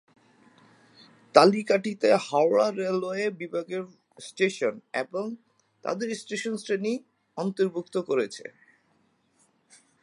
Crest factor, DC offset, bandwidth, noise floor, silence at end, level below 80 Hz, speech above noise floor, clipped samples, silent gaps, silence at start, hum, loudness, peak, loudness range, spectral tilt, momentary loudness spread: 26 dB; under 0.1%; 11.5 kHz; -68 dBFS; 1.55 s; -82 dBFS; 42 dB; under 0.1%; none; 1.35 s; none; -26 LUFS; -2 dBFS; 7 LU; -5 dB/octave; 16 LU